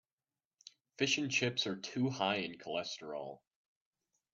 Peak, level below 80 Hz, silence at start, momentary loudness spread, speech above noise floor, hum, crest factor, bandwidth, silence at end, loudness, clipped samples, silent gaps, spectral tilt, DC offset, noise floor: -18 dBFS; -82 dBFS; 1 s; 13 LU; over 53 dB; none; 22 dB; 7.8 kHz; 1 s; -36 LUFS; under 0.1%; none; -3.5 dB/octave; under 0.1%; under -90 dBFS